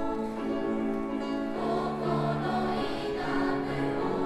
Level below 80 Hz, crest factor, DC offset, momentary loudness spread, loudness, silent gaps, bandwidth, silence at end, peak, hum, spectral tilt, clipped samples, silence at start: -50 dBFS; 12 dB; under 0.1%; 3 LU; -30 LUFS; none; 12.5 kHz; 0 s; -16 dBFS; none; -7 dB/octave; under 0.1%; 0 s